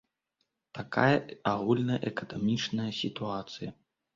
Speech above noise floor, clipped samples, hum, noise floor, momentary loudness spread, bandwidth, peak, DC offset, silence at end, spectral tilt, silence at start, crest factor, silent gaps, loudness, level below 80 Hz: 50 dB; under 0.1%; none; -81 dBFS; 15 LU; 7.6 kHz; -10 dBFS; under 0.1%; 0.45 s; -6 dB/octave; 0.75 s; 22 dB; none; -30 LUFS; -66 dBFS